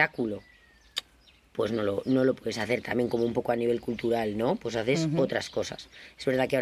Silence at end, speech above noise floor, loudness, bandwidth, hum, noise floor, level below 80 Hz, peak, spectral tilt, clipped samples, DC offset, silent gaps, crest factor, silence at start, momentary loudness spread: 0 s; 32 dB; -29 LUFS; 15 kHz; none; -60 dBFS; -58 dBFS; -8 dBFS; -5.5 dB/octave; under 0.1%; under 0.1%; none; 22 dB; 0 s; 10 LU